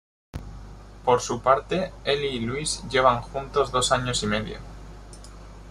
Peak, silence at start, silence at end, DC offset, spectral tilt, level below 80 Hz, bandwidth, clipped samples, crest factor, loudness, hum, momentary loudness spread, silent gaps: -4 dBFS; 0.35 s; 0 s; under 0.1%; -3.5 dB/octave; -42 dBFS; 13 kHz; under 0.1%; 22 dB; -24 LUFS; 50 Hz at -40 dBFS; 23 LU; none